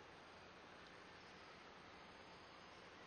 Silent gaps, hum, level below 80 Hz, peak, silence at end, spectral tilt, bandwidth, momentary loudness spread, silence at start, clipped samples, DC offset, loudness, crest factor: none; none; -82 dBFS; -48 dBFS; 0 s; -3.5 dB/octave; 9 kHz; 1 LU; 0 s; under 0.1%; under 0.1%; -60 LUFS; 12 dB